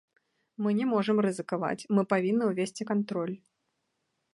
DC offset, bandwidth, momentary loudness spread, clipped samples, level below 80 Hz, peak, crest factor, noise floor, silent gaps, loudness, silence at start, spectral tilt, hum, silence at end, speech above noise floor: under 0.1%; 11.5 kHz; 7 LU; under 0.1%; -78 dBFS; -10 dBFS; 20 dB; -79 dBFS; none; -29 LUFS; 0.6 s; -6.5 dB/octave; none; 0.95 s; 51 dB